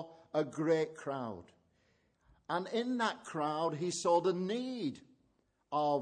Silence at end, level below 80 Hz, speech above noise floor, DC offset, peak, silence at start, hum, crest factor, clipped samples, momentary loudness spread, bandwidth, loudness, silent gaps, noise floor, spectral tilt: 0 s; -78 dBFS; 41 dB; under 0.1%; -18 dBFS; 0 s; none; 18 dB; under 0.1%; 10 LU; 10 kHz; -35 LUFS; none; -76 dBFS; -5 dB/octave